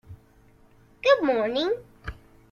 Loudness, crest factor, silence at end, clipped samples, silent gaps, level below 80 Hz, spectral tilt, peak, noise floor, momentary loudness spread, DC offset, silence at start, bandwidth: -24 LUFS; 20 dB; 0.4 s; under 0.1%; none; -50 dBFS; -5 dB/octave; -8 dBFS; -56 dBFS; 21 LU; under 0.1%; 0.1 s; 7 kHz